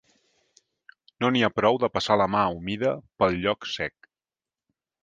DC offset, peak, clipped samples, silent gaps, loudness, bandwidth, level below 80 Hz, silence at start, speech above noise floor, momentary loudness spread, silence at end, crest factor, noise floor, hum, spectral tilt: under 0.1%; -6 dBFS; under 0.1%; none; -25 LUFS; 9.4 kHz; -56 dBFS; 1.2 s; over 66 dB; 7 LU; 1.15 s; 22 dB; under -90 dBFS; none; -5.5 dB/octave